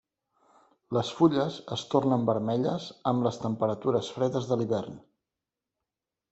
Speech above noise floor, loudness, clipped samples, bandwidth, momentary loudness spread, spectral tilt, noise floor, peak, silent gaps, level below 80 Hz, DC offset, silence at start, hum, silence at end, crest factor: 61 dB; -28 LUFS; under 0.1%; 8.2 kHz; 7 LU; -7 dB/octave; -89 dBFS; -8 dBFS; none; -68 dBFS; under 0.1%; 0.9 s; none; 1.35 s; 20 dB